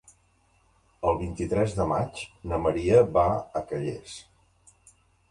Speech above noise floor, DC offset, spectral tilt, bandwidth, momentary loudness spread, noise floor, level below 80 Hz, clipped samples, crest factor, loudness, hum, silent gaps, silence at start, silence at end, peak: 39 dB; under 0.1%; -7 dB/octave; 11.5 kHz; 16 LU; -65 dBFS; -46 dBFS; under 0.1%; 20 dB; -26 LUFS; none; none; 1 s; 1.1 s; -8 dBFS